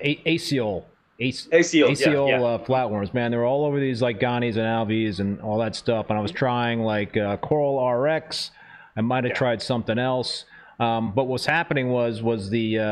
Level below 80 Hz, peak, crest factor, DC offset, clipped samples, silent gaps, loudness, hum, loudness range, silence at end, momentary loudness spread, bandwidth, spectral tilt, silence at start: -58 dBFS; -6 dBFS; 18 dB; under 0.1%; under 0.1%; none; -23 LUFS; none; 3 LU; 0 s; 8 LU; 13.5 kHz; -5.5 dB/octave; 0 s